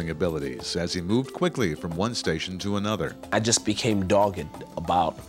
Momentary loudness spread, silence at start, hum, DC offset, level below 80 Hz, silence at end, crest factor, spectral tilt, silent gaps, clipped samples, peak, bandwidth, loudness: 7 LU; 0 s; none; under 0.1%; -50 dBFS; 0 s; 20 dB; -4.5 dB/octave; none; under 0.1%; -6 dBFS; 16 kHz; -26 LUFS